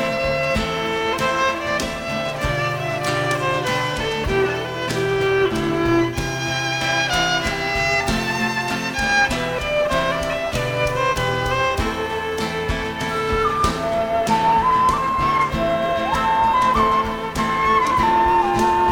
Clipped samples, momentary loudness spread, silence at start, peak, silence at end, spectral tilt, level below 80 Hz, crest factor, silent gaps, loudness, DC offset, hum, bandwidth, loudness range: under 0.1%; 6 LU; 0 s; -6 dBFS; 0 s; -4.5 dB/octave; -36 dBFS; 14 dB; none; -20 LUFS; under 0.1%; none; 19 kHz; 3 LU